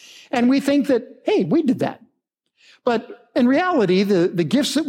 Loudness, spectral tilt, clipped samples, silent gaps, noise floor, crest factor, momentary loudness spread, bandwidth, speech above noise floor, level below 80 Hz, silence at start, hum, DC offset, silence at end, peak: -19 LUFS; -5.5 dB/octave; under 0.1%; none; -73 dBFS; 14 dB; 8 LU; 16 kHz; 54 dB; -70 dBFS; 0.35 s; none; under 0.1%; 0 s; -6 dBFS